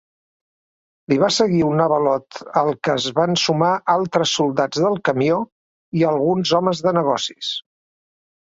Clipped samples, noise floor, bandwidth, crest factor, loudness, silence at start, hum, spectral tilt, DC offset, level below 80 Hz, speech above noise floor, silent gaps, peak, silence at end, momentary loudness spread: under 0.1%; under -90 dBFS; 8 kHz; 18 dB; -19 LUFS; 1.1 s; none; -5 dB/octave; under 0.1%; -60 dBFS; over 72 dB; 5.52-5.92 s; -2 dBFS; 0.85 s; 7 LU